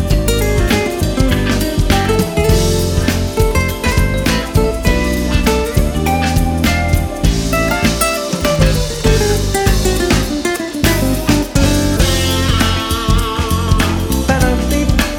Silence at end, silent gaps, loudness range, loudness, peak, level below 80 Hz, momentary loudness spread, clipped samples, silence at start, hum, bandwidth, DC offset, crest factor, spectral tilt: 0 s; none; 1 LU; -14 LUFS; 0 dBFS; -18 dBFS; 3 LU; under 0.1%; 0 s; none; over 20 kHz; under 0.1%; 14 dB; -5 dB/octave